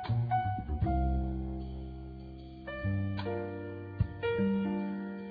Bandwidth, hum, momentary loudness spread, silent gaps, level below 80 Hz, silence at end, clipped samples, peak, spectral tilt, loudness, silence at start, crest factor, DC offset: 5 kHz; none; 14 LU; none; -40 dBFS; 0 s; under 0.1%; -18 dBFS; -11 dB/octave; -35 LUFS; 0 s; 16 dB; under 0.1%